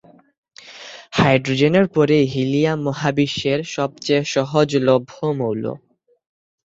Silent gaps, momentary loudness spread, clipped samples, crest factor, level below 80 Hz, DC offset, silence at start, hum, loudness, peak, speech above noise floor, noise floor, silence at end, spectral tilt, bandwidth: none; 10 LU; under 0.1%; 18 dB; -54 dBFS; under 0.1%; 0.65 s; none; -19 LUFS; -2 dBFS; 22 dB; -40 dBFS; 0.9 s; -6 dB/octave; 8 kHz